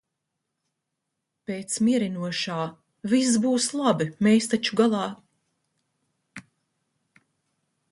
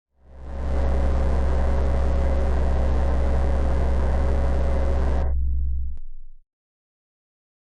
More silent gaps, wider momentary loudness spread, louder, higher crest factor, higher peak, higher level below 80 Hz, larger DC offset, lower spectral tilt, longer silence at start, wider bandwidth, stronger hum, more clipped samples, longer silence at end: neither; first, 14 LU vs 6 LU; about the same, -24 LUFS vs -25 LUFS; first, 18 dB vs 10 dB; about the same, -8 dBFS vs -10 dBFS; second, -70 dBFS vs -22 dBFS; neither; second, -4.5 dB/octave vs -8.5 dB/octave; first, 1.5 s vs 0.3 s; first, 11.5 kHz vs 6.6 kHz; neither; neither; first, 1.5 s vs 1.3 s